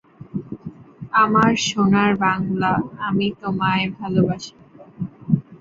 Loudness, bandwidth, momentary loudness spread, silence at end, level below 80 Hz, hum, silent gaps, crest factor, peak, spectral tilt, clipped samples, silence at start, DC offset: -19 LUFS; 7.8 kHz; 16 LU; 0.05 s; -52 dBFS; none; none; 20 dB; -2 dBFS; -5.5 dB/octave; under 0.1%; 0.2 s; under 0.1%